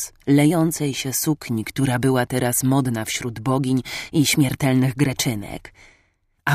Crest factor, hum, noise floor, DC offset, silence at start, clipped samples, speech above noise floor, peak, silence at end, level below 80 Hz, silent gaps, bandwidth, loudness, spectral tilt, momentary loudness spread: 16 dB; none; -64 dBFS; under 0.1%; 0 s; under 0.1%; 44 dB; -6 dBFS; 0 s; -50 dBFS; none; 15.5 kHz; -21 LUFS; -5 dB/octave; 8 LU